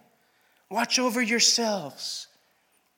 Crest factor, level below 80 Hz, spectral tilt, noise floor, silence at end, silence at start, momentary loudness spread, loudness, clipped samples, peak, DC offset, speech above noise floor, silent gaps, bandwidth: 20 dB; -90 dBFS; -1 dB/octave; -68 dBFS; 0.75 s; 0.7 s; 14 LU; -24 LUFS; under 0.1%; -8 dBFS; under 0.1%; 42 dB; none; 17.5 kHz